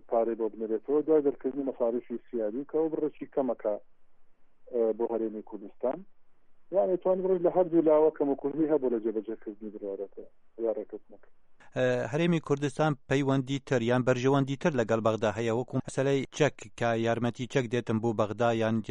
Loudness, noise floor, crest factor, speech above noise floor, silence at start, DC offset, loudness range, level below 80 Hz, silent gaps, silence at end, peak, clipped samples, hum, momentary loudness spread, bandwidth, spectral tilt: -29 LUFS; -52 dBFS; 18 dB; 23 dB; 0.05 s; under 0.1%; 6 LU; -64 dBFS; none; 0 s; -12 dBFS; under 0.1%; none; 11 LU; 10.5 kHz; -7 dB/octave